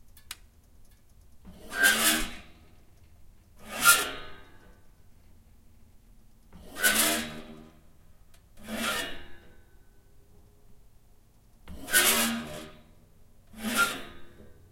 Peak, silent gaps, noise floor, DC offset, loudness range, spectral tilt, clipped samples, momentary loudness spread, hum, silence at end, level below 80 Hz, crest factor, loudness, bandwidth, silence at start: -6 dBFS; none; -57 dBFS; under 0.1%; 12 LU; -0.5 dB/octave; under 0.1%; 27 LU; none; 0.2 s; -52 dBFS; 28 dB; -25 LUFS; 16.5 kHz; 0.05 s